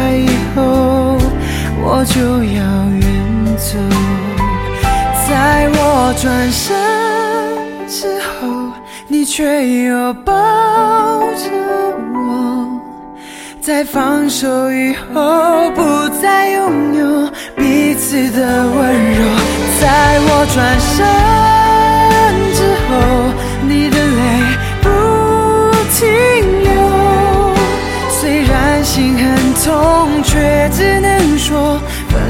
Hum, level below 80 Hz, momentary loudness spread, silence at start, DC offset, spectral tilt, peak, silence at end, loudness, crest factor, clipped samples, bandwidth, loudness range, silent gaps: none; -22 dBFS; 8 LU; 0 s; under 0.1%; -5 dB/octave; 0 dBFS; 0 s; -12 LUFS; 12 dB; under 0.1%; 16.5 kHz; 6 LU; none